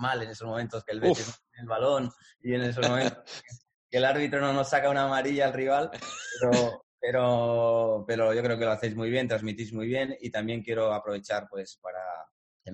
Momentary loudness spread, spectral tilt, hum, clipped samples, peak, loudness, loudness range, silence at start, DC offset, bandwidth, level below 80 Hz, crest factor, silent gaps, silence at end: 13 LU; -5 dB/octave; none; under 0.1%; -10 dBFS; -28 LUFS; 4 LU; 0 s; under 0.1%; 9 kHz; -64 dBFS; 18 dB; 3.74-3.89 s, 6.83-6.98 s, 11.78-11.82 s, 12.31-12.60 s; 0 s